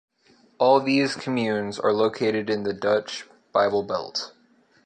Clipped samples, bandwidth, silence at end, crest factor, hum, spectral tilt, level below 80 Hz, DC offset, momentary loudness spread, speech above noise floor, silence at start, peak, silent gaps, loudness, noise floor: under 0.1%; 9.4 kHz; 0.55 s; 18 dB; none; -5 dB/octave; -66 dBFS; under 0.1%; 11 LU; 36 dB; 0.6 s; -6 dBFS; none; -23 LUFS; -59 dBFS